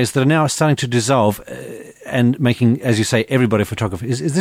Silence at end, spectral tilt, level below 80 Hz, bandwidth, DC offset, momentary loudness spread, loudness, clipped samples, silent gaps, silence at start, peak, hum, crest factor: 0 s; -5.5 dB/octave; -50 dBFS; 16 kHz; under 0.1%; 13 LU; -17 LUFS; under 0.1%; none; 0 s; -2 dBFS; none; 14 dB